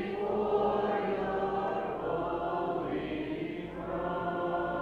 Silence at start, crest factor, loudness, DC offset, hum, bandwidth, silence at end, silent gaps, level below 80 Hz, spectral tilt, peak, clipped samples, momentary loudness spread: 0 s; 16 dB; -33 LUFS; under 0.1%; none; 7 kHz; 0 s; none; -56 dBFS; -8 dB/octave; -18 dBFS; under 0.1%; 7 LU